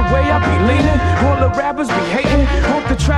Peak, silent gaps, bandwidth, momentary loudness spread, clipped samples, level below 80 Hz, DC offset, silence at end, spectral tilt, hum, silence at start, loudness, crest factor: -2 dBFS; none; 11 kHz; 3 LU; under 0.1%; -22 dBFS; under 0.1%; 0 s; -6.5 dB/octave; none; 0 s; -15 LUFS; 12 dB